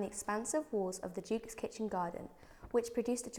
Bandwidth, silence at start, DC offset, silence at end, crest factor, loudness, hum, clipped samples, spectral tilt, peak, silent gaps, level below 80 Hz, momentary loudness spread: 20 kHz; 0 s; under 0.1%; 0 s; 18 dB; -38 LUFS; none; under 0.1%; -4.5 dB/octave; -20 dBFS; none; -64 dBFS; 9 LU